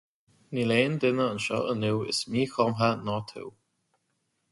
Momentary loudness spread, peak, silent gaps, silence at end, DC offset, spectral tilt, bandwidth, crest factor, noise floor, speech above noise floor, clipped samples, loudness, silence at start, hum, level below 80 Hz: 11 LU; -10 dBFS; none; 1 s; under 0.1%; -5.5 dB/octave; 11.5 kHz; 18 dB; -76 dBFS; 49 dB; under 0.1%; -27 LUFS; 0.5 s; none; -64 dBFS